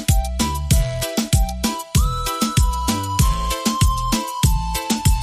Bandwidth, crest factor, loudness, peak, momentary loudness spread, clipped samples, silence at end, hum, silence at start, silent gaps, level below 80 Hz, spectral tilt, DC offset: 15.5 kHz; 14 dB; -20 LUFS; -4 dBFS; 3 LU; under 0.1%; 0 s; none; 0 s; none; -22 dBFS; -4.5 dB/octave; under 0.1%